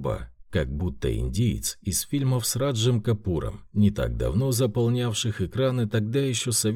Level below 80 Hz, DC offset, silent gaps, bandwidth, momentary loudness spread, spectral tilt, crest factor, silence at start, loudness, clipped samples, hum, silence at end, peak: -38 dBFS; under 0.1%; none; 17 kHz; 6 LU; -5 dB/octave; 14 dB; 0 s; -26 LUFS; under 0.1%; none; 0 s; -10 dBFS